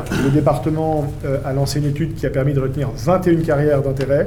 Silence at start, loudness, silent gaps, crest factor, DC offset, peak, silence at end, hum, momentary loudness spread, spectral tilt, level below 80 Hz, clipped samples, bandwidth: 0 s; -18 LUFS; none; 12 dB; under 0.1%; -4 dBFS; 0 s; none; 6 LU; -7.5 dB/octave; -34 dBFS; under 0.1%; 15.5 kHz